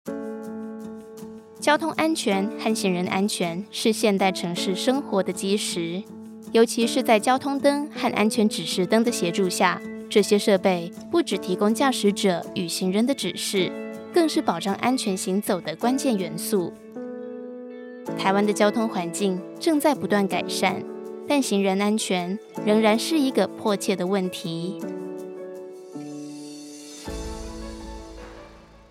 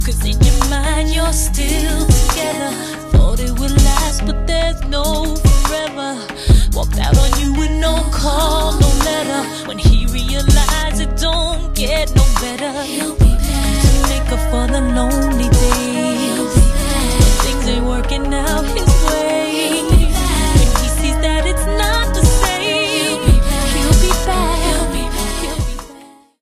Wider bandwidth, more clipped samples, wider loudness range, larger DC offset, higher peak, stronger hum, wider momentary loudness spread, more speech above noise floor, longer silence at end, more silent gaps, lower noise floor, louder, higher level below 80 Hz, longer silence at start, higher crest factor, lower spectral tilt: about the same, 16 kHz vs 15.5 kHz; neither; first, 6 LU vs 2 LU; neither; second, -4 dBFS vs 0 dBFS; neither; first, 17 LU vs 6 LU; about the same, 24 dB vs 25 dB; second, 0.15 s vs 0.4 s; neither; first, -47 dBFS vs -41 dBFS; second, -23 LUFS vs -16 LUFS; second, -52 dBFS vs -16 dBFS; about the same, 0.05 s vs 0 s; first, 20 dB vs 14 dB; about the same, -4.5 dB/octave vs -4.5 dB/octave